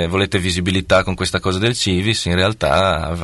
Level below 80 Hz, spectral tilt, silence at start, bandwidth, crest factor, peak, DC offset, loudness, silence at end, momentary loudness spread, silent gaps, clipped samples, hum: -36 dBFS; -4.5 dB/octave; 0 s; 12 kHz; 14 dB; -2 dBFS; under 0.1%; -17 LUFS; 0 s; 3 LU; none; under 0.1%; none